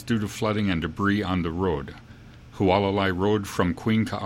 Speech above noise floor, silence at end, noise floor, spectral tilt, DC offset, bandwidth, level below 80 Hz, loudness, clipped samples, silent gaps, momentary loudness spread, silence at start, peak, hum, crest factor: 21 dB; 0 s; -45 dBFS; -6.5 dB/octave; under 0.1%; 16.5 kHz; -46 dBFS; -25 LUFS; under 0.1%; none; 6 LU; 0 s; -6 dBFS; none; 18 dB